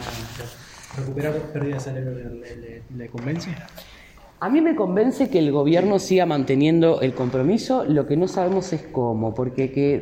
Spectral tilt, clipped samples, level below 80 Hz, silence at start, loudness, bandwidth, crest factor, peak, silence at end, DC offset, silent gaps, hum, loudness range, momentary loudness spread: -7 dB/octave; under 0.1%; -50 dBFS; 0 s; -21 LUFS; 16.5 kHz; 16 dB; -6 dBFS; 0 s; under 0.1%; none; none; 11 LU; 18 LU